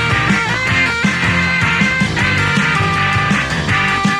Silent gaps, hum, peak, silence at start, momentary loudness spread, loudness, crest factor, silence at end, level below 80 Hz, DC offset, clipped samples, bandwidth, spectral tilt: none; none; -2 dBFS; 0 s; 1 LU; -13 LUFS; 14 dB; 0 s; -34 dBFS; under 0.1%; under 0.1%; 14.5 kHz; -4.5 dB/octave